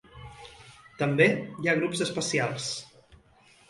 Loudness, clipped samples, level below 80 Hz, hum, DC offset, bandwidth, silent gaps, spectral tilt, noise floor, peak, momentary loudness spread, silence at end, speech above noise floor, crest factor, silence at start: -27 LUFS; under 0.1%; -62 dBFS; none; under 0.1%; 11.5 kHz; none; -4.5 dB/octave; -59 dBFS; -8 dBFS; 24 LU; 0.85 s; 32 dB; 22 dB; 0.15 s